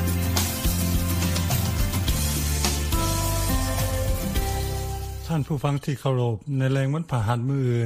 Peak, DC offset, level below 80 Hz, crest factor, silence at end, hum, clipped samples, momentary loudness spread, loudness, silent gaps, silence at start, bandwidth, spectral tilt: -6 dBFS; under 0.1%; -30 dBFS; 16 dB; 0 s; none; under 0.1%; 4 LU; -25 LUFS; none; 0 s; 15.5 kHz; -5 dB/octave